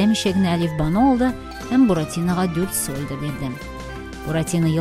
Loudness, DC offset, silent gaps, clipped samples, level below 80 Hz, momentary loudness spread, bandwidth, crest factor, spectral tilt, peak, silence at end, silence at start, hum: -21 LUFS; under 0.1%; none; under 0.1%; -38 dBFS; 14 LU; 16 kHz; 14 dB; -5.5 dB/octave; -6 dBFS; 0 s; 0 s; none